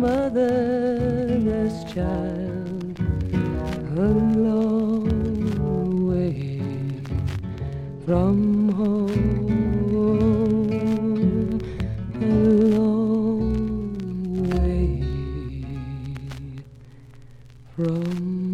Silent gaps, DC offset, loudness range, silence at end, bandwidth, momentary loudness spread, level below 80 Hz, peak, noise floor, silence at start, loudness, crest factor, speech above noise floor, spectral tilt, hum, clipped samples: none; under 0.1%; 7 LU; 0 s; 8.4 kHz; 11 LU; -34 dBFS; -8 dBFS; -44 dBFS; 0 s; -23 LUFS; 14 dB; 23 dB; -9.5 dB/octave; none; under 0.1%